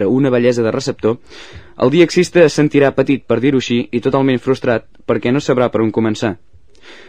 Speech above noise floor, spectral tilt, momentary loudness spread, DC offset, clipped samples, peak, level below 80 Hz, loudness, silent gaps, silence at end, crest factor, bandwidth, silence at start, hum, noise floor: 27 dB; -6 dB/octave; 9 LU; 0.9%; under 0.1%; 0 dBFS; -48 dBFS; -15 LUFS; none; 0.15 s; 14 dB; 10.5 kHz; 0 s; none; -42 dBFS